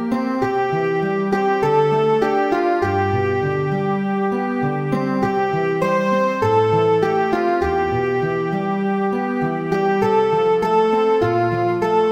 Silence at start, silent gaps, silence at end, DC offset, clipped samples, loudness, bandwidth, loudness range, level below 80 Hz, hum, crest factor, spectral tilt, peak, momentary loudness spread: 0 s; none; 0 s; under 0.1%; under 0.1%; -19 LUFS; 15 kHz; 2 LU; -48 dBFS; none; 14 dB; -7.5 dB/octave; -4 dBFS; 4 LU